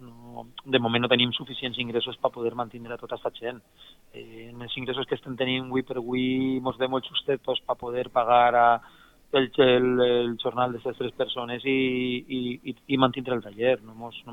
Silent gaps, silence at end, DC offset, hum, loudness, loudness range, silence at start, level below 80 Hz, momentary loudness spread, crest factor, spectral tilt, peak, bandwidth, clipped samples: none; 0 s; under 0.1%; none; -26 LUFS; 9 LU; 0 s; -60 dBFS; 16 LU; 20 dB; -7 dB/octave; -6 dBFS; 5.6 kHz; under 0.1%